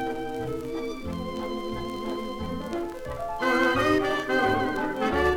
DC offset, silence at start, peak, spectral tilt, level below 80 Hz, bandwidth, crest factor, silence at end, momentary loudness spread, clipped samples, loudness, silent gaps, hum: under 0.1%; 0 s; -10 dBFS; -5.5 dB/octave; -46 dBFS; 18 kHz; 16 dB; 0 s; 11 LU; under 0.1%; -28 LUFS; none; none